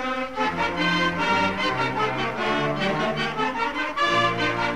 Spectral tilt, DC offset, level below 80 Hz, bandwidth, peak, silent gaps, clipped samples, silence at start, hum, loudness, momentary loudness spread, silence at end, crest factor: -4.5 dB/octave; 0.6%; -50 dBFS; 15.5 kHz; -10 dBFS; none; under 0.1%; 0 s; none; -23 LUFS; 4 LU; 0 s; 14 dB